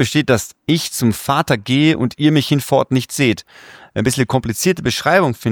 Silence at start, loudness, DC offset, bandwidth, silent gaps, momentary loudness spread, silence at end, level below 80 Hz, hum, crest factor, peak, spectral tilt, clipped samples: 0 s; -16 LUFS; under 0.1%; over 20 kHz; none; 5 LU; 0 s; -46 dBFS; none; 16 dB; 0 dBFS; -5 dB/octave; under 0.1%